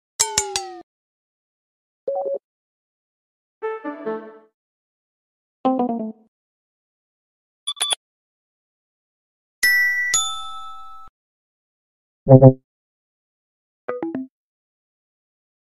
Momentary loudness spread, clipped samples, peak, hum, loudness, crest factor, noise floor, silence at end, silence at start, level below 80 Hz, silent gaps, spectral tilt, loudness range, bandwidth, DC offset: 20 LU; under 0.1%; 0 dBFS; none; -19 LUFS; 24 dB; -39 dBFS; 1.5 s; 0.2 s; -56 dBFS; 0.83-2.07 s, 2.44-3.61 s, 4.54-5.64 s, 6.28-7.67 s, 7.96-9.62 s, 11.09-12.26 s, 12.64-13.88 s; -4.5 dB/octave; 13 LU; 15 kHz; under 0.1%